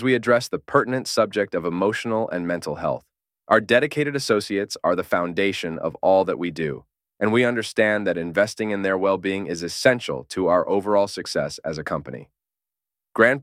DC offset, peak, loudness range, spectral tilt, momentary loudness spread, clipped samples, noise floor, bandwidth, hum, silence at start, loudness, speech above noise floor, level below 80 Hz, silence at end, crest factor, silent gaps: under 0.1%; -2 dBFS; 2 LU; -5 dB/octave; 9 LU; under 0.1%; -89 dBFS; 15.5 kHz; none; 0 s; -22 LUFS; 67 dB; -58 dBFS; 0 s; 20 dB; none